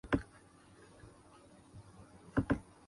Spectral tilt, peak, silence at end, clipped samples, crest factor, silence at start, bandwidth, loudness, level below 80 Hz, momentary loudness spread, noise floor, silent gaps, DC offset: -7.5 dB/octave; -18 dBFS; 0.25 s; under 0.1%; 24 dB; 0.05 s; 11.5 kHz; -38 LUFS; -54 dBFS; 24 LU; -61 dBFS; none; under 0.1%